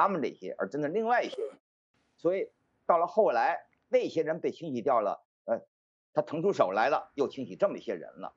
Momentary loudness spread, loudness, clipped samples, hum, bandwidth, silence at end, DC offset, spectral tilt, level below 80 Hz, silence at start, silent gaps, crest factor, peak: 12 LU; -30 LUFS; under 0.1%; none; 7.6 kHz; 0.05 s; under 0.1%; -6.5 dB/octave; -82 dBFS; 0 s; 1.60-1.94 s, 5.25-5.45 s, 5.68-6.13 s; 20 dB; -10 dBFS